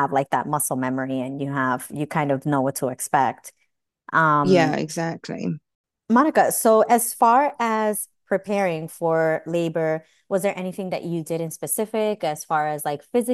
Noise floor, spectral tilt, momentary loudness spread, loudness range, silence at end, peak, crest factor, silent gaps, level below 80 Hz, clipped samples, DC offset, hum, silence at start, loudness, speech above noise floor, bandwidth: -52 dBFS; -5 dB/octave; 11 LU; 5 LU; 0 s; -4 dBFS; 18 dB; 5.75-5.84 s; -68 dBFS; under 0.1%; under 0.1%; none; 0 s; -22 LUFS; 30 dB; 13 kHz